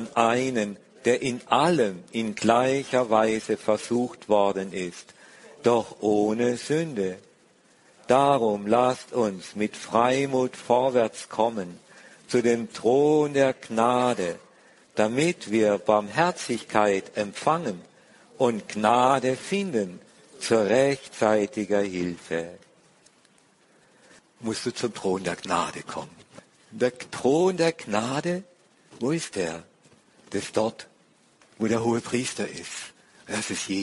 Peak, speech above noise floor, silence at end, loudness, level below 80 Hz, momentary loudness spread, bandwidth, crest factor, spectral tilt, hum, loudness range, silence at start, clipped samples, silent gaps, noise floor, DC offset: -2 dBFS; 36 dB; 0 s; -25 LUFS; -64 dBFS; 11 LU; 11.5 kHz; 22 dB; -5 dB/octave; none; 7 LU; 0 s; under 0.1%; none; -60 dBFS; under 0.1%